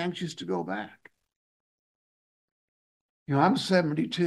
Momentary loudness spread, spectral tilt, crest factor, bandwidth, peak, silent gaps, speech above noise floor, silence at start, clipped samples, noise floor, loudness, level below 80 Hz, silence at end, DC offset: 14 LU; -6 dB/octave; 22 dB; 12.5 kHz; -8 dBFS; 1.36-3.26 s; over 63 dB; 0 s; under 0.1%; under -90 dBFS; -27 LUFS; -74 dBFS; 0 s; under 0.1%